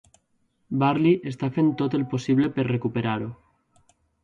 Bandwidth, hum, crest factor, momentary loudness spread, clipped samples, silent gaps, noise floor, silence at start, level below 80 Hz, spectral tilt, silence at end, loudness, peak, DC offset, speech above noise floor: 7.8 kHz; none; 16 dB; 8 LU; under 0.1%; none; -69 dBFS; 0.7 s; -60 dBFS; -8 dB/octave; 0.9 s; -24 LUFS; -8 dBFS; under 0.1%; 46 dB